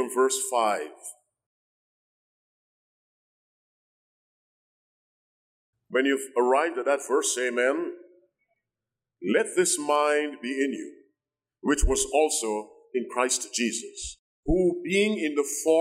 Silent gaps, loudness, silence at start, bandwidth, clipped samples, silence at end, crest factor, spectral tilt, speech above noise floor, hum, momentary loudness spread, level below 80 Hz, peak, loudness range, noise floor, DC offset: 1.46-5.73 s, 14.19-14.43 s; -26 LUFS; 0 s; 16 kHz; under 0.1%; 0 s; 18 dB; -3 dB/octave; 63 dB; none; 13 LU; -42 dBFS; -10 dBFS; 6 LU; -89 dBFS; under 0.1%